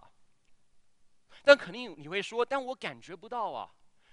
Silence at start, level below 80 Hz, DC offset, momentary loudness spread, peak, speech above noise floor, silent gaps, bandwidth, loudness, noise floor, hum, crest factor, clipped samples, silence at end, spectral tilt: 1.45 s; -74 dBFS; under 0.1%; 19 LU; -4 dBFS; 32 dB; none; 10.5 kHz; -29 LUFS; -62 dBFS; none; 28 dB; under 0.1%; 0.45 s; -3.5 dB/octave